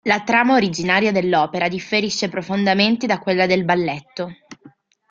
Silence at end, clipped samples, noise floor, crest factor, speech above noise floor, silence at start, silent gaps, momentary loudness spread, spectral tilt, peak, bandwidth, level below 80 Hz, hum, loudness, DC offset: 0.45 s; under 0.1%; -49 dBFS; 18 dB; 31 dB; 0.05 s; none; 9 LU; -4.5 dB/octave; -2 dBFS; 7.6 kHz; -58 dBFS; none; -18 LUFS; under 0.1%